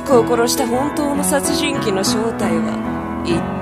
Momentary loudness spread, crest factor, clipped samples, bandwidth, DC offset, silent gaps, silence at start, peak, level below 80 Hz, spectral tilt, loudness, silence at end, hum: 6 LU; 18 dB; under 0.1%; 14.5 kHz; under 0.1%; none; 0 s; 0 dBFS; -40 dBFS; -4 dB/octave; -18 LUFS; 0 s; none